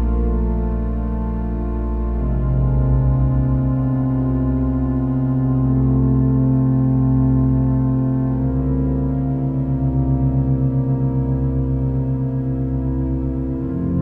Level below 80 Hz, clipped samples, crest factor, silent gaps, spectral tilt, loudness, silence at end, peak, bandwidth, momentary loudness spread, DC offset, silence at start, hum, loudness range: -24 dBFS; under 0.1%; 12 dB; none; -13 dB/octave; -19 LUFS; 0 s; -6 dBFS; 2.5 kHz; 6 LU; under 0.1%; 0 s; none; 3 LU